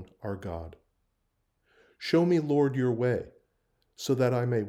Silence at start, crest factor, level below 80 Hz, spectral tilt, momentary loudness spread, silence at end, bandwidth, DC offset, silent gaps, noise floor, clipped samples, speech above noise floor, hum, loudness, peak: 0 s; 18 dB; -62 dBFS; -7 dB/octave; 15 LU; 0 s; 15.5 kHz; under 0.1%; none; -77 dBFS; under 0.1%; 50 dB; none; -28 LUFS; -12 dBFS